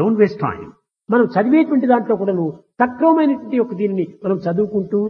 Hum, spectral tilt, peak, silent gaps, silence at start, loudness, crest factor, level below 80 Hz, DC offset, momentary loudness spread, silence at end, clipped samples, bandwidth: none; -10 dB/octave; -2 dBFS; none; 0 s; -17 LUFS; 16 dB; -60 dBFS; under 0.1%; 8 LU; 0 s; under 0.1%; 5.6 kHz